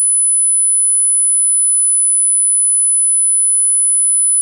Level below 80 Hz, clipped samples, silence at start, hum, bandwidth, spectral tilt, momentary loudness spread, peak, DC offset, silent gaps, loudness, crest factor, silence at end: under -90 dBFS; under 0.1%; 0 s; none; 14.5 kHz; 10 dB/octave; 0 LU; -8 dBFS; under 0.1%; none; -9 LUFS; 4 dB; 0 s